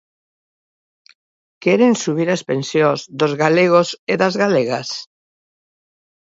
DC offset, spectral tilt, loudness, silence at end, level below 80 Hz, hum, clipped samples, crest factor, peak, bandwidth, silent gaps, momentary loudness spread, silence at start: under 0.1%; -5 dB/octave; -17 LUFS; 1.35 s; -66 dBFS; none; under 0.1%; 18 dB; 0 dBFS; 8 kHz; 3.99-4.07 s; 8 LU; 1.6 s